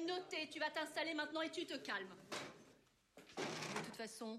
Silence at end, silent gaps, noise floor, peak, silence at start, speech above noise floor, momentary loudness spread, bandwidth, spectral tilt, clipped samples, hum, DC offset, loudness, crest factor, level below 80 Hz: 0 s; none; -71 dBFS; -28 dBFS; 0 s; 26 dB; 9 LU; 15 kHz; -3 dB/octave; under 0.1%; none; under 0.1%; -45 LUFS; 18 dB; -86 dBFS